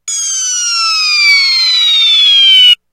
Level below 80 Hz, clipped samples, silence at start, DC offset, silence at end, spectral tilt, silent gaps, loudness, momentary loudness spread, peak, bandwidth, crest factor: -68 dBFS; 0.3%; 0.05 s; under 0.1%; 0.15 s; 8.5 dB/octave; none; -6 LUFS; 9 LU; 0 dBFS; 17 kHz; 10 dB